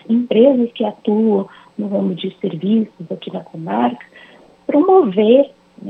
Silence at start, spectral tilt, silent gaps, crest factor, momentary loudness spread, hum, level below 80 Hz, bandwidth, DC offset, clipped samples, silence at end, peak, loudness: 0.1 s; -9.5 dB/octave; none; 16 dB; 16 LU; none; -70 dBFS; 4.2 kHz; under 0.1%; under 0.1%; 0 s; 0 dBFS; -16 LUFS